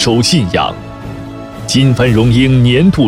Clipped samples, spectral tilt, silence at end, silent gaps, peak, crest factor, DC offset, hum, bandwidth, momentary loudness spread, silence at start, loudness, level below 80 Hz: under 0.1%; -5.5 dB/octave; 0 s; none; 0 dBFS; 10 dB; under 0.1%; none; 13 kHz; 17 LU; 0 s; -10 LUFS; -30 dBFS